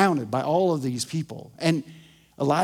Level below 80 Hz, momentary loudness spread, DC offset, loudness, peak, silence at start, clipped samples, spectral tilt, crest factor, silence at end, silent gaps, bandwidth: -66 dBFS; 9 LU; under 0.1%; -25 LUFS; -6 dBFS; 0 s; under 0.1%; -5.5 dB/octave; 18 dB; 0 s; none; 16 kHz